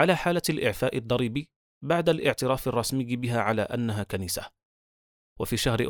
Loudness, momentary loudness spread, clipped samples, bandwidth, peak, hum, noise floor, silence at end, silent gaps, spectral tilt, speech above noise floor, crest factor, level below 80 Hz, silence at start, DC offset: -27 LUFS; 9 LU; under 0.1%; over 20 kHz; -6 dBFS; none; under -90 dBFS; 0 s; 1.56-1.81 s, 4.65-5.36 s; -5 dB/octave; over 64 dB; 22 dB; -50 dBFS; 0 s; under 0.1%